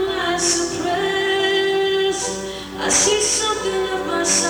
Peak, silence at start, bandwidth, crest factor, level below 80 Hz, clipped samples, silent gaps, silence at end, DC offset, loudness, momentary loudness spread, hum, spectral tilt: -4 dBFS; 0 s; over 20 kHz; 16 dB; -46 dBFS; under 0.1%; none; 0 s; under 0.1%; -18 LUFS; 8 LU; none; -1.5 dB/octave